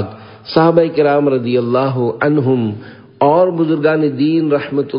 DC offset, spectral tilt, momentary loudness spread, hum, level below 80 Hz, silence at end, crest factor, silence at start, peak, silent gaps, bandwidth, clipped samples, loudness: under 0.1%; -11 dB/octave; 6 LU; none; -54 dBFS; 0 s; 14 dB; 0 s; 0 dBFS; none; 5.4 kHz; under 0.1%; -14 LUFS